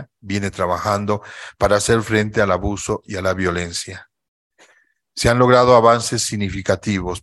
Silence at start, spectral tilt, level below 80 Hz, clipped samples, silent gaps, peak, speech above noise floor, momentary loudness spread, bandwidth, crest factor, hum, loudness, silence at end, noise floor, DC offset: 0 s; -4.5 dB/octave; -42 dBFS; under 0.1%; 4.28-4.50 s; 0 dBFS; 41 dB; 13 LU; 12.5 kHz; 18 dB; none; -18 LUFS; 0.05 s; -59 dBFS; under 0.1%